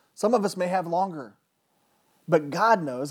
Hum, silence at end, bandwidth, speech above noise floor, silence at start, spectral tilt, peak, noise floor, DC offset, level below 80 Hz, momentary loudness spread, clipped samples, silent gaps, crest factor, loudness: none; 0 s; 17.5 kHz; 46 dB; 0.2 s; -5.5 dB/octave; -8 dBFS; -70 dBFS; under 0.1%; -88 dBFS; 9 LU; under 0.1%; none; 18 dB; -25 LUFS